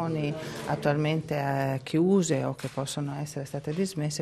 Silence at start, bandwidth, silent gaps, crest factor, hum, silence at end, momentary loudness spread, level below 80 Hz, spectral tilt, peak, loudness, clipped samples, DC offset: 0 s; 13 kHz; none; 16 dB; none; 0 s; 10 LU; -62 dBFS; -6 dB/octave; -12 dBFS; -29 LUFS; under 0.1%; under 0.1%